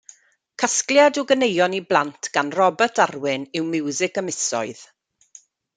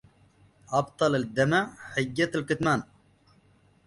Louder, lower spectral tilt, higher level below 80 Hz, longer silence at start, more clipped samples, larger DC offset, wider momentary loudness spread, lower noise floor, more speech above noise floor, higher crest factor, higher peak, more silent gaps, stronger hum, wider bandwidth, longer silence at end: first, -20 LUFS vs -27 LUFS; second, -2.5 dB/octave vs -5.5 dB/octave; second, -72 dBFS vs -60 dBFS; about the same, 0.6 s vs 0.7 s; neither; neither; first, 9 LU vs 6 LU; second, -51 dBFS vs -62 dBFS; second, 31 dB vs 35 dB; about the same, 20 dB vs 20 dB; first, -2 dBFS vs -10 dBFS; neither; neither; second, 9.6 kHz vs 11.5 kHz; second, 0.9 s vs 1.05 s